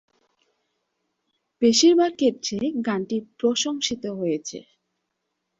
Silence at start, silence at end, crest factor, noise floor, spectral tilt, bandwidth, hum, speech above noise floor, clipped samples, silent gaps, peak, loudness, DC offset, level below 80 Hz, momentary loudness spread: 1.6 s; 0.95 s; 18 dB; -78 dBFS; -3.5 dB/octave; 7.8 kHz; none; 56 dB; under 0.1%; none; -6 dBFS; -22 LUFS; under 0.1%; -66 dBFS; 13 LU